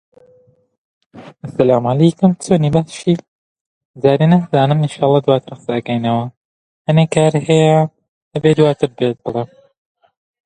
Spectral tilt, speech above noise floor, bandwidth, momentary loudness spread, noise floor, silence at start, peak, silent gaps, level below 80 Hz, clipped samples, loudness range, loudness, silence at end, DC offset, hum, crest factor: -7 dB/octave; 38 dB; 10 kHz; 11 LU; -52 dBFS; 1.15 s; 0 dBFS; 3.28-3.94 s, 6.37-6.85 s, 8.08-8.31 s; -52 dBFS; under 0.1%; 2 LU; -15 LUFS; 1 s; under 0.1%; none; 16 dB